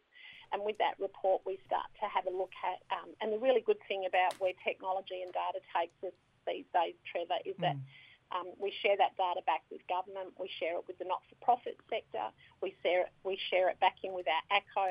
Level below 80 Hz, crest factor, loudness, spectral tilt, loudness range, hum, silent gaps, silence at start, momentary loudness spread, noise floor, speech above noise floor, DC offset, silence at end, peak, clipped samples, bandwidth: -78 dBFS; 22 dB; -35 LUFS; -5.5 dB/octave; 3 LU; none; none; 0.15 s; 11 LU; -56 dBFS; 21 dB; under 0.1%; 0 s; -14 dBFS; under 0.1%; 11.5 kHz